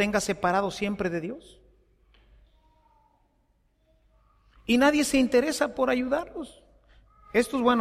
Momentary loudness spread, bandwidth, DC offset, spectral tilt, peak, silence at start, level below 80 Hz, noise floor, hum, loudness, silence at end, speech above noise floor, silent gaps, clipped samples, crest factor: 17 LU; 15 kHz; under 0.1%; -4 dB/octave; -10 dBFS; 0 s; -54 dBFS; -68 dBFS; none; -25 LUFS; 0 s; 43 dB; none; under 0.1%; 18 dB